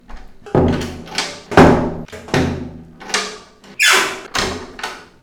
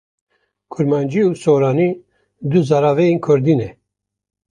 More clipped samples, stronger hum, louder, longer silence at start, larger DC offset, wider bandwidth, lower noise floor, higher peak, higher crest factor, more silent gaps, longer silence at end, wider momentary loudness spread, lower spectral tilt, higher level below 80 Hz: neither; neither; about the same, -16 LUFS vs -16 LUFS; second, 0.1 s vs 0.7 s; neither; first, 19.5 kHz vs 10 kHz; second, -37 dBFS vs -78 dBFS; about the same, 0 dBFS vs -2 dBFS; about the same, 18 dB vs 16 dB; neither; second, 0.2 s vs 0.8 s; first, 18 LU vs 13 LU; second, -4 dB/octave vs -8 dB/octave; first, -36 dBFS vs -56 dBFS